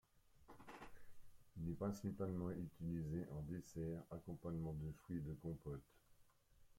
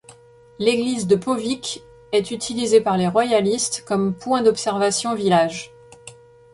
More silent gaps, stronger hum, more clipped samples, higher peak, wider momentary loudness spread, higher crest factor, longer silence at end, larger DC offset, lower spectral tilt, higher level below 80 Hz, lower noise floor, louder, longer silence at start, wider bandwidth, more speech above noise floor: neither; neither; neither; second, -32 dBFS vs -4 dBFS; first, 14 LU vs 8 LU; about the same, 16 dB vs 18 dB; second, 0.05 s vs 0.4 s; neither; first, -8.5 dB/octave vs -4.5 dB/octave; second, -66 dBFS vs -58 dBFS; first, -72 dBFS vs -48 dBFS; second, -49 LUFS vs -20 LUFS; about the same, 0.15 s vs 0.1 s; first, 16.5 kHz vs 11.5 kHz; second, 24 dB vs 28 dB